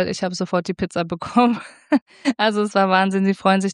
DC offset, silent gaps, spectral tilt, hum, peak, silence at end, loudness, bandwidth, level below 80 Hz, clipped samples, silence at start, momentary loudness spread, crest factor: under 0.1%; 2.02-2.06 s; -5.5 dB/octave; none; -2 dBFS; 0 s; -20 LUFS; 10.5 kHz; -56 dBFS; under 0.1%; 0 s; 8 LU; 18 dB